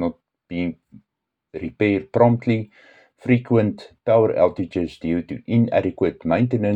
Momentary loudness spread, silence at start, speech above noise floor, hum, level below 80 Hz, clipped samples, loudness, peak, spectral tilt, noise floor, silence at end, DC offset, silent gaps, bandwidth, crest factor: 13 LU; 0 s; 61 dB; none; -56 dBFS; under 0.1%; -21 LUFS; -2 dBFS; -9.5 dB/octave; -81 dBFS; 0 s; under 0.1%; none; 7.8 kHz; 20 dB